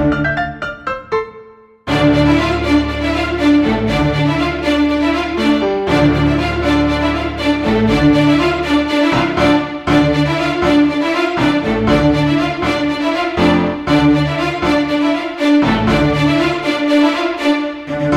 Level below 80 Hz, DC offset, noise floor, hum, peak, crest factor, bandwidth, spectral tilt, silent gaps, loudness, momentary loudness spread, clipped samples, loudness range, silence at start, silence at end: -30 dBFS; under 0.1%; -40 dBFS; none; -2 dBFS; 12 dB; 11 kHz; -6.5 dB/octave; none; -14 LUFS; 5 LU; under 0.1%; 1 LU; 0 s; 0 s